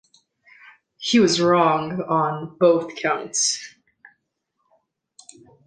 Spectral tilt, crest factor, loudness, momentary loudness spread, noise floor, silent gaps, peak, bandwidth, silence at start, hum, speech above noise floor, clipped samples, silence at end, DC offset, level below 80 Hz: -3.5 dB/octave; 18 dB; -20 LUFS; 9 LU; -75 dBFS; none; -4 dBFS; 10 kHz; 1 s; none; 55 dB; under 0.1%; 2 s; under 0.1%; -66 dBFS